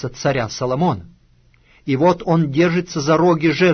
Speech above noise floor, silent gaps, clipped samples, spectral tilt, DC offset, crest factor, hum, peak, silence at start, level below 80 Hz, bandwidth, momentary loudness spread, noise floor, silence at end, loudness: 37 dB; none; under 0.1%; -6.5 dB/octave; under 0.1%; 14 dB; none; -4 dBFS; 0 s; -48 dBFS; 6.6 kHz; 7 LU; -54 dBFS; 0 s; -17 LUFS